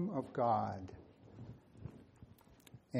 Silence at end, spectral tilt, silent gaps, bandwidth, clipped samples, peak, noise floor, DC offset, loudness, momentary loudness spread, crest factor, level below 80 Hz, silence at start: 0 s; -8.5 dB/octave; none; 15.5 kHz; under 0.1%; -22 dBFS; -63 dBFS; under 0.1%; -37 LUFS; 26 LU; 18 dB; -68 dBFS; 0 s